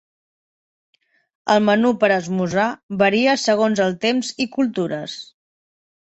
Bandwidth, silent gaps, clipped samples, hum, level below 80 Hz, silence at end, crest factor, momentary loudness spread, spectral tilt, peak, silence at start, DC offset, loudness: 8.2 kHz; 2.83-2.89 s; under 0.1%; none; -64 dBFS; 0.8 s; 18 dB; 9 LU; -5 dB/octave; -2 dBFS; 1.45 s; under 0.1%; -19 LUFS